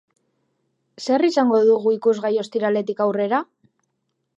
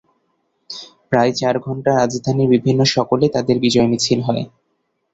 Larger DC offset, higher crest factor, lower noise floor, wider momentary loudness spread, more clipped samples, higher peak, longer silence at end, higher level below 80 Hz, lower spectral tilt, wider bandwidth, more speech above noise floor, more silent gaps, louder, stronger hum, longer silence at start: neither; about the same, 16 dB vs 16 dB; first, -74 dBFS vs -69 dBFS; second, 7 LU vs 17 LU; neither; second, -6 dBFS vs -2 dBFS; first, 0.95 s vs 0.65 s; second, -80 dBFS vs -52 dBFS; about the same, -5.5 dB/octave vs -5.5 dB/octave; about the same, 8 kHz vs 8 kHz; about the same, 56 dB vs 53 dB; neither; second, -20 LUFS vs -17 LUFS; neither; first, 1 s vs 0.7 s